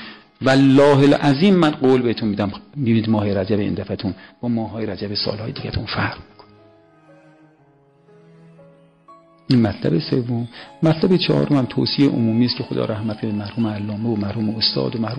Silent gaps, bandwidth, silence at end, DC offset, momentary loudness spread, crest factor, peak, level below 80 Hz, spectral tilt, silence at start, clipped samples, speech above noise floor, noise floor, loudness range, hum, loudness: none; 10 kHz; 0 s; under 0.1%; 12 LU; 14 dB; -4 dBFS; -50 dBFS; -7.5 dB/octave; 0 s; under 0.1%; 36 dB; -54 dBFS; 11 LU; none; -19 LUFS